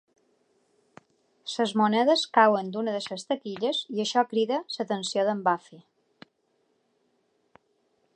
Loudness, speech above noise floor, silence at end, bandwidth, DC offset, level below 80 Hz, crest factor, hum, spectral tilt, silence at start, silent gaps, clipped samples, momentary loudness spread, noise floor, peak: -26 LUFS; 46 dB; 2.35 s; 10 kHz; under 0.1%; -84 dBFS; 22 dB; none; -4 dB/octave; 1.45 s; none; under 0.1%; 11 LU; -72 dBFS; -6 dBFS